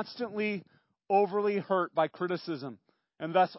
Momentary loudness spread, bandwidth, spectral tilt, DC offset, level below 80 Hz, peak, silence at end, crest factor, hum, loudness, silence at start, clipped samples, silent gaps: 12 LU; 5.8 kHz; -9.5 dB/octave; under 0.1%; -84 dBFS; -12 dBFS; 0 s; 18 dB; none; -31 LUFS; 0 s; under 0.1%; none